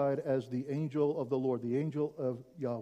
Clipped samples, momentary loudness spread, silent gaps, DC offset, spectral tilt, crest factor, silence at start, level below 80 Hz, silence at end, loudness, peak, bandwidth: under 0.1%; 6 LU; none; under 0.1%; -9.5 dB/octave; 14 dB; 0 s; -76 dBFS; 0 s; -34 LUFS; -20 dBFS; 9.6 kHz